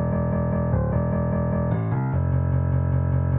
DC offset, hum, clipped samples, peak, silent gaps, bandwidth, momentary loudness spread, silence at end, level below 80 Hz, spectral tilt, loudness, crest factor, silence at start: under 0.1%; none; under 0.1%; -12 dBFS; none; 2.8 kHz; 1 LU; 0 s; -32 dBFS; -14.5 dB/octave; -23 LUFS; 10 dB; 0 s